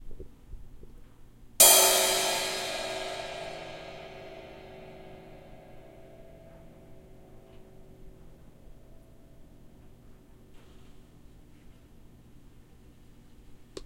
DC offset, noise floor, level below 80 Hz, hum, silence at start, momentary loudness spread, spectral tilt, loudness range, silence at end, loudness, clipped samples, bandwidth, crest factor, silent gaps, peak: under 0.1%; -53 dBFS; -54 dBFS; none; 0 s; 32 LU; 0 dB/octave; 26 LU; 0 s; -22 LUFS; under 0.1%; 16.5 kHz; 28 dB; none; -4 dBFS